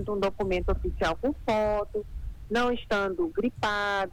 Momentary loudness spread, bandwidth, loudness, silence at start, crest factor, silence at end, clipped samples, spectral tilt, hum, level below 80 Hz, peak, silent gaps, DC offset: 5 LU; 19 kHz; -28 LUFS; 0 s; 14 dB; 0 s; under 0.1%; -5.5 dB/octave; none; -38 dBFS; -14 dBFS; none; under 0.1%